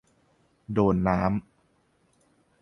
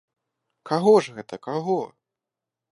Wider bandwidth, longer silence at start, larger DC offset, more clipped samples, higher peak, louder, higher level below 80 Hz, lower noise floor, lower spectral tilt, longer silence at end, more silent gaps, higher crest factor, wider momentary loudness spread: second, 6.4 kHz vs 11.5 kHz; about the same, 0.7 s vs 0.65 s; neither; neither; about the same, -8 dBFS vs -6 dBFS; second, -26 LUFS vs -22 LUFS; first, -48 dBFS vs -76 dBFS; second, -67 dBFS vs -87 dBFS; first, -9.5 dB/octave vs -6.5 dB/octave; first, 1.2 s vs 0.85 s; neither; about the same, 22 dB vs 20 dB; second, 9 LU vs 17 LU